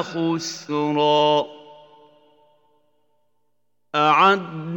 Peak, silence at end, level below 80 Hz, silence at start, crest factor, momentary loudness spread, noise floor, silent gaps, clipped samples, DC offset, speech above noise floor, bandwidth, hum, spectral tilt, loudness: -2 dBFS; 0 s; -80 dBFS; 0 s; 20 dB; 11 LU; -76 dBFS; none; under 0.1%; under 0.1%; 57 dB; 17 kHz; 60 Hz at -75 dBFS; -4.5 dB/octave; -19 LUFS